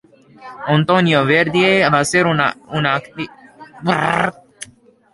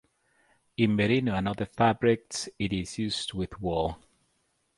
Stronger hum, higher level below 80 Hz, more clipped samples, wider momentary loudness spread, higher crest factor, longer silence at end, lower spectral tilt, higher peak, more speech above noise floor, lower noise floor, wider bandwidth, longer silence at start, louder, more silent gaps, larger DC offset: neither; about the same, -54 dBFS vs -50 dBFS; neither; first, 17 LU vs 10 LU; about the same, 16 dB vs 20 dB; second, 0.5 s vs 0.8 s; about the same, -5 dB/octave vs -5.5 dB/octave; first, -2 dBFS vs -8 dBFS; second, 32 dB vs 46 dB; second, -47 dBFS vs -73 dBFS; about the same, 11.5 kHz vs 11.5 kHz; second, 0.4 s vs 0.8 s; first, -15 LUFS vs -28 LUFS; neither; neither